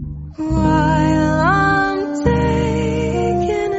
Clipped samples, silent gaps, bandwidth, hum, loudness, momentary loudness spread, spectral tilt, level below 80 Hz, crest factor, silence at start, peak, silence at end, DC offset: under 0.1%; none; 8 kHz; none; -16 LUFS; 5 LU; -6 dB/octave; -28 dBFS; 14 dB; 0 s; -2 dBFS; 0 s; under 0.1%